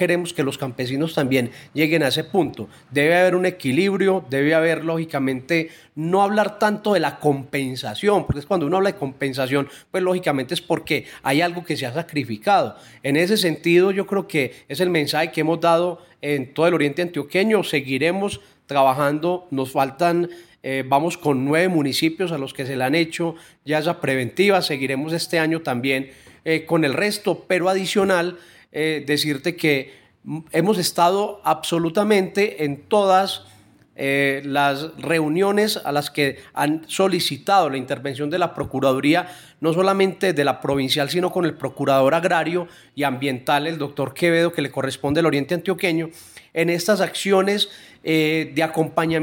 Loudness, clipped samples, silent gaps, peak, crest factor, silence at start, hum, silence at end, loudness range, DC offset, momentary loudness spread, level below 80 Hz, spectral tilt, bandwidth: -21 LUFS; under 0.1%; none; -4 dBFS; 16 dB; 0 s; none; 0 s; 2 LU; under 0.1%; 8 LU; -56 dBFS; -5 dB/octave; 17 kHz